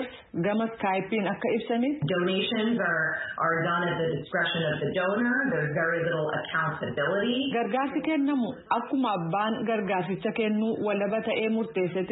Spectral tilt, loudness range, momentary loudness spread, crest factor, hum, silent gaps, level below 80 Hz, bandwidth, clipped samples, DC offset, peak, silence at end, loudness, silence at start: -10 dB/octave; 1 LU; 3 LU; 16 dB; none; none; -66 dBFS; 4.1 kHz; under 0.1%; under 0.1%; -10 dBFS; 0 s; -27 LUFS; 0 s